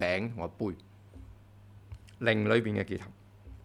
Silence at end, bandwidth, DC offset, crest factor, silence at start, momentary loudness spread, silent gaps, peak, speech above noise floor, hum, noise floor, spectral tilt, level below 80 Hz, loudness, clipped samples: 0.05 s; 11.5 kHz; under 0.1%; 24 dB; 0 s; 25 LU; none; -10 dBFS; 23 dB; 50 Hz at -55 dBFS; -54 dBFS; -7 dB/octave; -56 dBFS; -31 LUFS; under 0.1%